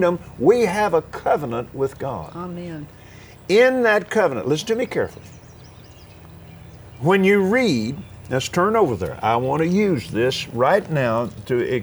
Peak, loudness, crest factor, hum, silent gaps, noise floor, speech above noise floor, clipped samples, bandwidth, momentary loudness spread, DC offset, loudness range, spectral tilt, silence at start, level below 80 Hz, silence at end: -2 dBFS; -20 LUFS; 18 dB; none; none; -43 dBFS; 24 dB; under 0.1%; over 20 kHz; 14 LU; under 0.1%; 3 LU; -6 dB/octave; 0 s; -50 dBFS; 0 s